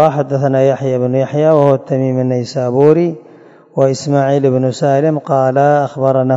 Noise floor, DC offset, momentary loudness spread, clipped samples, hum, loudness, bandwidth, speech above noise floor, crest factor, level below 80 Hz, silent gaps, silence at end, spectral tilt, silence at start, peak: -38 dBFS; under 0.1%; 6 LU; 0.3%; none; -13 LUFS; 7.8 kHz; 26 dB; 12 dB; -62 dBFS; none; 0 s; -7.5 dB/octave; 0 s; 0 dBFS